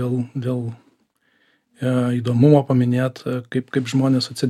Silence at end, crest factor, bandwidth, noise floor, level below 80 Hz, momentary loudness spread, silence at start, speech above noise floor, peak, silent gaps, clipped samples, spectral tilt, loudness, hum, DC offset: 0 s; 18 dB; 13 kHz; -64 dBFS; -66 dBFS; 12 LU; 0 s; 45 dB; -2 dBFS; none; under 0.1%; -7.5 dB/octave; -20 LUFS; none; under 0.1%